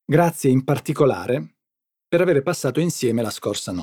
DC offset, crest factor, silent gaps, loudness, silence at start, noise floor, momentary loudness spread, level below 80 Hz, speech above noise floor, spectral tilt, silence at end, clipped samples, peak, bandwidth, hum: under 0.1%; 18 dB; none; -21 LUFS; 0.1 s; -85 dBFS; 8 LU; -62 dBFS; 65 dB; -6 dB/octave; 0 s; under 0.1%; -2 dBFS; 18.5 kHz; none